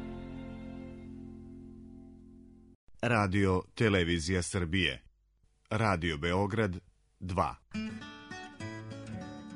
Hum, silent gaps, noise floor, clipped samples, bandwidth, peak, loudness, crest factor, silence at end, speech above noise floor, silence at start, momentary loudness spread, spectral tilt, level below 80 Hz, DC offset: none; 2.75-2.87 s; -70 dBFS; under 0.1%; 10.5 kHz; -12 dBFS; -32 LUFS; 22 dB; 0 s; 39 dB; 0 s; 20 LU; -5.5 dB/octave; -52 dBFS; under 0.1%